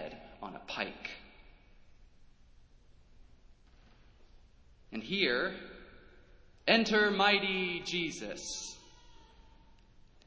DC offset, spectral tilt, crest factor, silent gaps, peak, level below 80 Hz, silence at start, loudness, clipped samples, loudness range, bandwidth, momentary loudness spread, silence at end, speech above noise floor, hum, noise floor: under 0.1%; -3 dB/octave; 26 dB; none; -12 dBFS; -62 dBFS; 0 s; -32 LUFS; under 0.1%; 16 LU; 8 kHz; 21 LU; 1.05 s; 28 dB; none; -60 dBFS